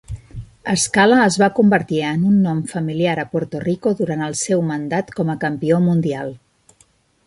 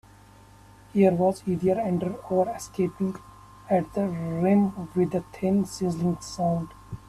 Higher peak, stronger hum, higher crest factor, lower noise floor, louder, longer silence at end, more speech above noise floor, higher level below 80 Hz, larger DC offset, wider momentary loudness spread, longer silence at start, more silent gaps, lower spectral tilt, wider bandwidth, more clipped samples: first, -2 dBFS vs -8 dBFS; second, none vs 50 Hz at -45 dBFS; about the same, 16 dB vs 18 dB; first, -57 dBFS vs -51 dBFS; first, -18 LUFS vs -26 LUFS; first, 0.9 s vs 0.1 s; first, 40 dB vs 26 dB; first, -48 dBFS vs -54 dBFS; neither; about the same, 10 LU vs 8 LU; second, 0.1 s vs 0.95 s; neither; second, -5.5 dB/octave vs -7.5 dB/octave; second, 11.5 kHz vs 13.5 kHz; neither